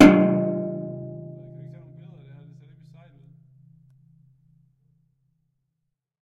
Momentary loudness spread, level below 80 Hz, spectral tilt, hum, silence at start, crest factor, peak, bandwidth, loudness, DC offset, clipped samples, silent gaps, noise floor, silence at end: 27 LU; -54 dBFS; -7 dB/octave; none; 0 s; 26 dB; 0 dBFS; 11 kHz; -22 LUFS; under 0.1%; under 0.1%; none; -80 dBFS; 4.95 s